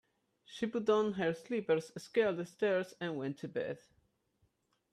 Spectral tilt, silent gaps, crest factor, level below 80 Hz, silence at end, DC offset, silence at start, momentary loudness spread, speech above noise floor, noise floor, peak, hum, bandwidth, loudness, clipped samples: -6 dB/octave; none; 18 dB; -78 dBFS; 1.15 s; under 0.1%; 0.5 s; 9 LU; 42 dB; -77 dBFS; -20 dBFS; none; 12.5 kHz; -35 LUFS; under 0.1%